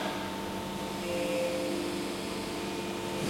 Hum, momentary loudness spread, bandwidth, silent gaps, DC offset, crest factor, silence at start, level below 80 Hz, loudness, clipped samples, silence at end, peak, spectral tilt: none; 5 LU; 16.5 kHz; none; under 0.1%; 14 dB; 0 s; -58 dBFS; -34 LUFS; under 0.1%; 0 s; -20 dBFS; -4.5 dB/octave